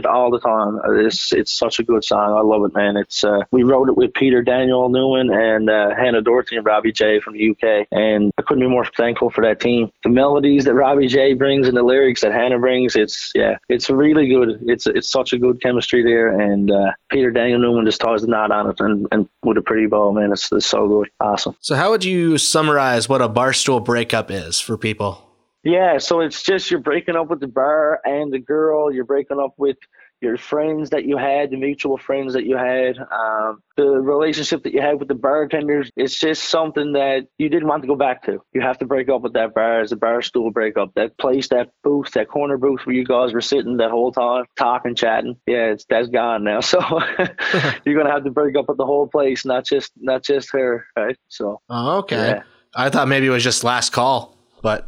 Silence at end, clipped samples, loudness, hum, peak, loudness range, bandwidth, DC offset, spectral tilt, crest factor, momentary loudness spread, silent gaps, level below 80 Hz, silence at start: 0 s; under 0.1%; -17 LUFS; none; 0 dBFS; 5 LU; 15.5 kHz; under 0.1%; -4.5 dB/octave; 18 dB; 7 LU; none; -52 dBFS; 0 s